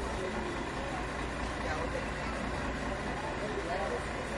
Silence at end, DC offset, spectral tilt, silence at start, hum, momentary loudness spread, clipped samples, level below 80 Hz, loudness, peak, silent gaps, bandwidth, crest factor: 0 s; under 0.1%; -5 dB/octave; 0 s; none; 2 LU; under 0.1%; -44 dBFS; -36 LUFS; -22 dBFS; none; 11.5 kHz; 12 dB